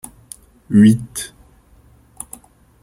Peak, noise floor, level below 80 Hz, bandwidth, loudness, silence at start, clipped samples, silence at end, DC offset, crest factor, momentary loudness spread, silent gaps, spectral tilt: -2 dBFS; -50 dBFS; -50 dBFS; 15.5 kHz; -15 LUFS; 0.7 s; under 0.1%; 1.55 s; under 0.1%; 18 dB; 27 LU; none; -6 dB/octave